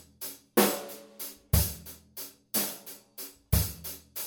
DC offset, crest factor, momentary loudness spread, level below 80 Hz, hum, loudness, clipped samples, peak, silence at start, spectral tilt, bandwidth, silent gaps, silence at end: under 0.1%; 24 dB; 17 LU; -40 dBFS; none; -30 LUFS; under 0.1%; -8 dBFS; 0.2 s; -4 dB/octave; over 20 kHz; none; 0 s